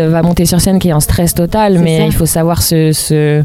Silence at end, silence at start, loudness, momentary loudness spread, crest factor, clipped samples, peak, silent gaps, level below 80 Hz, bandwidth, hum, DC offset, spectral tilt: 0 s; 0 s; -10 LUFS; 2 LU; 10 dB; under 0.1%; 0 dBFS; none; -24 dBFS; 16.5 kHz; none; under 0.1%; -5.5 dB/octave